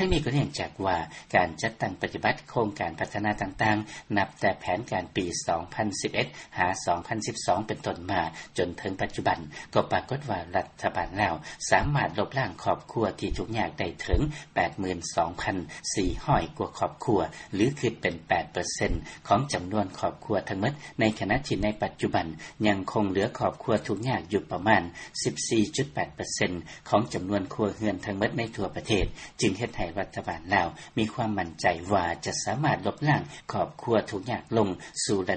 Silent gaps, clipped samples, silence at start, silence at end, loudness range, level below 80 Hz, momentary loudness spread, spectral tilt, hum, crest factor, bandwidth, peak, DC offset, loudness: none; under 0.1%; 0 s; 0 s; 2 LU; -44 dBFS; 6 LU; -5 dB/octave; none; 22 dB; 8.8 kHz; -8 dBFS; under 0.1%; -29 LUFS